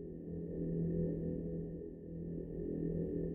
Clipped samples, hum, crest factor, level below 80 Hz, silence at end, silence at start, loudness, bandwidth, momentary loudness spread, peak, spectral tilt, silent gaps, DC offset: under 0.1%; none; 14 dB; -54 dBFS; 0 s; 0 s; -41 LUFS; 2 kHz; 9 LU; -26 dBFS; -13.5 dB/octave; none; under 0.1%